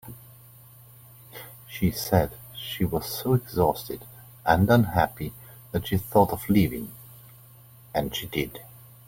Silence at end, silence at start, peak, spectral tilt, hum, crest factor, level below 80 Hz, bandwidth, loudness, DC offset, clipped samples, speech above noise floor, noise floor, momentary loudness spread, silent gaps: 0.3 s; 0.05 s; -6 dBFS; -6 dB/octave; none; 22 dB; -48 dBFS; 17 kHz; -25 LUFS; under 0.1%; under 0.1%; 26 dB; -51 dBFS; 23 LU; none